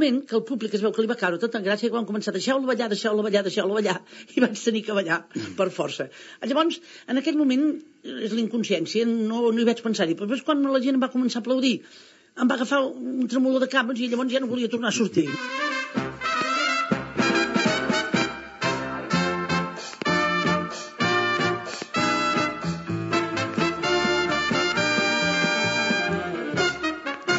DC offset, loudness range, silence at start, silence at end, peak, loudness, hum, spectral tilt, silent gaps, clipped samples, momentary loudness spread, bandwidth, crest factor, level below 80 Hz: under 0.1%; 3 LU; 0 s; 0 s; -6 dBFS; -24 LUFS; none; -3 dB/octave; none; under 0.1%; 7 LU; 8 kHz; 18 dB; -60 dBFS